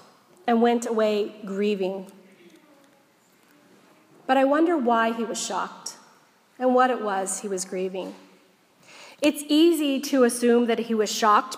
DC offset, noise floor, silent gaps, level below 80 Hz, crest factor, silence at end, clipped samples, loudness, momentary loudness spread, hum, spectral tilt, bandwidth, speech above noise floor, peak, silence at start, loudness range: under 0.1%; -60 dBFS; none; -82 dBFS; 18 dB; 0 s; under 0.1%; -23 LUFS; 12 LU; none; -3.5 dB/octave; 15.5 kHz; 37 dB; -6 dBFS; 0.45 s; 5 LU